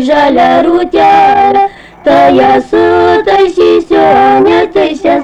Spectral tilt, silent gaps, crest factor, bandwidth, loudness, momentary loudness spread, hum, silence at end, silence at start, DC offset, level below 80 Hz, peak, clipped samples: -6 dB/octave; none; 6 dB; 9 kHz; -7 LUFS; 5 LU; none; 0 s; 0 s; under 0.1%; -38 dBFS; 0 dBFS; under 0.1%